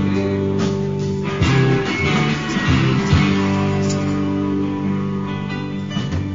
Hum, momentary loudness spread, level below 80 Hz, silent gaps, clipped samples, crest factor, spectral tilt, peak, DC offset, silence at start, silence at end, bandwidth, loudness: none; 8 LU; -38 dBFS; none; under 0.1%; 16 dB; -6.5 dB/octave; -2 dBFS; 0.7%; 0 s; 0 s; 7.8 kHz; -19 LUFS